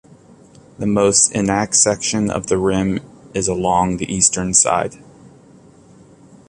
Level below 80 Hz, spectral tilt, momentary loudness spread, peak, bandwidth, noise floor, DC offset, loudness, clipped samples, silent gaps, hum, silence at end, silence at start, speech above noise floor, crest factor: -44 dBFS; -3.5 dB/octave; 10 LU; 0 dBFS; 11.5 kHz; -46 dBFS; under 0.1%; -16 LUFS; under 0.1%; none; none; 1.45 s; 0.8 s; 29 dB; 18 dB